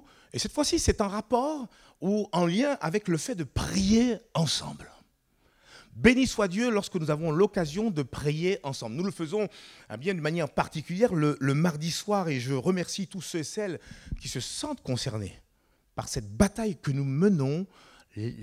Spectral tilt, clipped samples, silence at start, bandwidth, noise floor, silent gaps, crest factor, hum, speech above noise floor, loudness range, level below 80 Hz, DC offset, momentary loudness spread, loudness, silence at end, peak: -5 dB/octave; under 0.1%; 0.35 s; 15.5 kHz; -68 dBFS; none; 24 dB; none; 40 dB; 5 LU; -48 dBFS; under 0.1%; 13 LU; -28 LUFS; 0 s; -4 dBFS